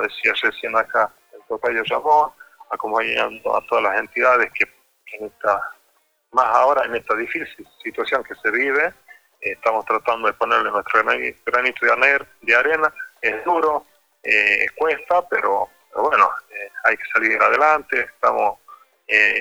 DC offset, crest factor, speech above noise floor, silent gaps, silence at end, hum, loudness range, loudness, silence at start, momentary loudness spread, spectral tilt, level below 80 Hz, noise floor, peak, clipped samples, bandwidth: under 0.1%; 18 dB; 44 dB; none; 0 s; none; 3 LU; -19 LUFS; 0 s; 11 LU; -3 dB/octave; -62 dBFS; -63 dBFS; -2 dBFS; under 0.1%; over 20 kHz